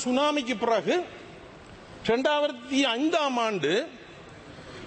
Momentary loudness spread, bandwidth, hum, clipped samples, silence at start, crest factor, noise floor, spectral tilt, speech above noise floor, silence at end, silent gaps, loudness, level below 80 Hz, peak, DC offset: 22 LU; 8.8 kHz; none; under 0.1%; 0 s; 14 dB; -47 dBFS; -4 dB/octave; 21 dB; 0 s; none; -26 LUFS; -60 dBFS; -12 dBFS; under 0.1%